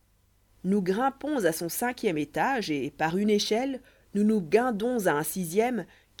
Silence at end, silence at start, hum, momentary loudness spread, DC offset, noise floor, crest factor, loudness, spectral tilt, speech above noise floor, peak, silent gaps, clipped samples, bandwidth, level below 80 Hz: 0.35 s; 0.65 s; none; 8 LU; under 0.1%; -65 dBFS; 18 dB; -27 LUFS; -5 dB/octave; 38 dB; -10 dBFS; none; under 0.1%; 19 kHz; -62 dBFS